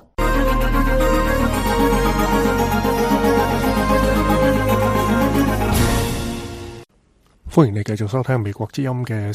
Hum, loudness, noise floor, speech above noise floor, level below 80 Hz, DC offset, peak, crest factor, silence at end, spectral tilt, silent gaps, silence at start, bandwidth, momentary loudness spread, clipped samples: none; -18 LUFS; -57 dBFS; 38 dB; -26 dBFS; under 0.1%; -2 dBFS; 16 dB; 0 s; -6 dB/octave; none; 0.2 s; 15.5 kHz; 7 LU; under 0.1%